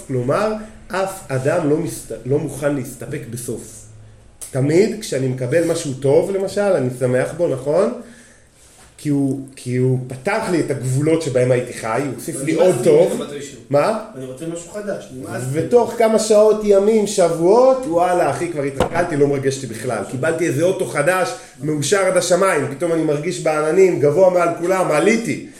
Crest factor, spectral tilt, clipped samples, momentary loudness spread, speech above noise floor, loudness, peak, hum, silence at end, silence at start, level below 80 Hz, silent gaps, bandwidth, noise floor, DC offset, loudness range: 16 dB; -5.5 dB/octave; under 0.1%; 13 LU; 30 dB; -18 LUFS; -2 dBFS; none; 0 s; 0 s; -50 dBFS; none; 16 kHz; -48 dBFS; under 0.1%; 7 LU